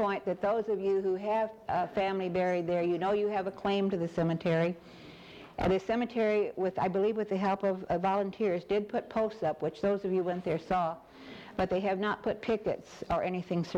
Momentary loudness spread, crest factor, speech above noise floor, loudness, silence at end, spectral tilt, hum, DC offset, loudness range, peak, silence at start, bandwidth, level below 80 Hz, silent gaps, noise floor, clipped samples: 5 LU; 14 dB; 19 dB; -31 LUFS; 0 s; -7.5 dB/octave; none; under 0.1%; 2 LU; -18 dBFS; 0 s; 8.6 kHz; -58 dBFS; none; -50 dBFS; under 0.1%